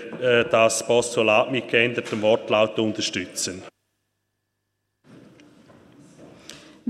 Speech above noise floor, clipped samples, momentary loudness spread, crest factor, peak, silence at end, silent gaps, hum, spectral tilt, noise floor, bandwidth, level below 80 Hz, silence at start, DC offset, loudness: 56 dB; under 0.1%; 10 LU; 22 dB; -2 dBFS; 0 s; none; 50 Hz at -65 dBFS; -3.5 dB/octave; -77 dBFS; 14.5 kHz; -64 dBFS; 0 s; under 0.1%; -21 LUFS